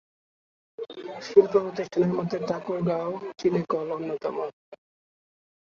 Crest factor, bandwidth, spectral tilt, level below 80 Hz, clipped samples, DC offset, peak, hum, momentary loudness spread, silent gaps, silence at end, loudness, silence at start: 24 dB; 7 kHz; -7.5 dB/octave; -68 dBFS; under 0.1%; under 0.1%; -4 dBFS; none; 16 LU; 4.53-4.72 s; 0.9 s; -26 LUFS; 0.8 s